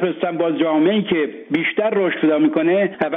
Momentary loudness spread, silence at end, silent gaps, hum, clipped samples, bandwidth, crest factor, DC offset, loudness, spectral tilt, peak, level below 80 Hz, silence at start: 5 LU; 0 s; none; none; under 0.1%; 3.9 kHz; 12 dB; under 0.1%; -18 LUFS; -4.5 dB/octave; -4 dBFS; -64 dBFS; 0 s